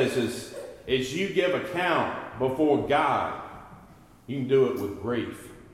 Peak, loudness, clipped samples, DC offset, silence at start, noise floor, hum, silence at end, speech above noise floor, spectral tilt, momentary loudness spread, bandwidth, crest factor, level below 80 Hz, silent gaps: -12 dBFS; -27 LUFS; under 0.1%; under 0.1%; 0 s; -52 dBFS; none; 0.05 s; 26 dB; -5.5 dB/octave; 15 LU; 15.5 kHz; 16 dB; -58 dBFS; none